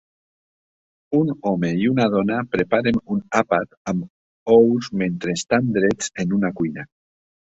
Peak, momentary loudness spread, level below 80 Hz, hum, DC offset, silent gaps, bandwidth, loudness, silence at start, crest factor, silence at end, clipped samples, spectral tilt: -2 dBFS; 10 LU; -54 dBFS; none; under 0.1%; 3.77-3.85 s, 4.10-4.46 s; 8 kHz; -20 LUFS; 1.1 s; 18 dB; 0.7 s; under 0.1%; -6 dB/octave